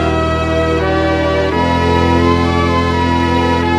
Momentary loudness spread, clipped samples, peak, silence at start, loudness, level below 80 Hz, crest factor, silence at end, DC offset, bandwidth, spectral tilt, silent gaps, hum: 3 LU; under 0.1%; 0 dBFS; 0 s; -13 LUFS; -26 dBFS; 12 dB; 0 s; under 0.1%; 10.5 kHz; -6.5 dB/octave; none; none